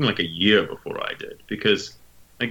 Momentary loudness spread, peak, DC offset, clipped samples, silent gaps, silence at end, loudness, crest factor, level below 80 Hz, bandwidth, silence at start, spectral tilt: 15 LU; -4 dBFS; under 0.1%; under 0.1%; none; 0 s; -23 LUFS; 20 dB; -56 dBFS; 18.5 kHz; 0 s; -5 dB/octave